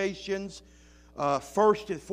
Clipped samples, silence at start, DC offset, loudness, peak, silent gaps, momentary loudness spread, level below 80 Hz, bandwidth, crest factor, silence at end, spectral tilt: under 0.1%; 0 s; under 0.1%; -28 LUFS; -10 dBFS; none; 20 LU; -58 dBFS; 15 kHz; 20 dB; 0 s; -5 dB/octave